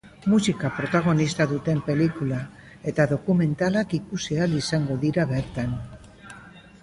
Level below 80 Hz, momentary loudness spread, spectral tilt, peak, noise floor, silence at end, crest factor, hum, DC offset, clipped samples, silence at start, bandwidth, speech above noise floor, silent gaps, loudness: -50 dBFS; 13 LU; -6.5 dB/octave; -8 dBFS; -46 dBFS; 0.25 s; 18 dB; none; under 0.1%; under 0.1%; 0.05 s; 11.5 kHz; 23 dB; none; -24 LUFS